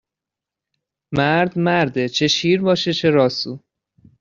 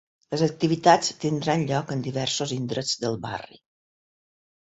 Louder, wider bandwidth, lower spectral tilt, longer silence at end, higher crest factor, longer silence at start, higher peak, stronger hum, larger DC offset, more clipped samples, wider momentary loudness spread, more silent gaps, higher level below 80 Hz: first, -18 LUFS vs -25 LUFS; about the same, 7.6 kHz vs 8.2 kHz; about the same, -4 dB/octave vs -4.5 dB/octave; second, 0.6 s vs 1.25 s; second, 18 dB vs 24 dB; first, 1.1 s vs 0.3 s; about the same, -2 dBFS vs -2 dBFS; neither; neither; neither; second, 9 LU vs 12 LU; neither; first, -56 dBFS vs -62 dBFS